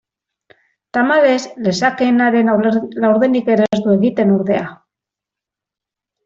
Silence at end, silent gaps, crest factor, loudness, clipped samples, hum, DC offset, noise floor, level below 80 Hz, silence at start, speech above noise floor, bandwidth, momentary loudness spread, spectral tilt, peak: 1.5 s; none; 14 dB; -15 LUFS; under 0.1%; none; under 0.1%; -86 dBFS; -60 dBFS; 0.95 s; 72 dB; 7.6 kHz; 6 LU; -6.5 dB/octave; -2 dBFS